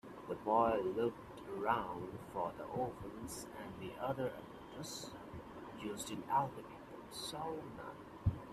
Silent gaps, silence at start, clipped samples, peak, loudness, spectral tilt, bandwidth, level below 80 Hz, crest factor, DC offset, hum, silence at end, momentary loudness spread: none; 0.05 s; under 0.1%; -20 dBFS; -41 LUFS; -5.5 dB/octave; 15.5 kHz; -60 dBFS; 22 dB; under 0.1%; none; 0 s; 15 LU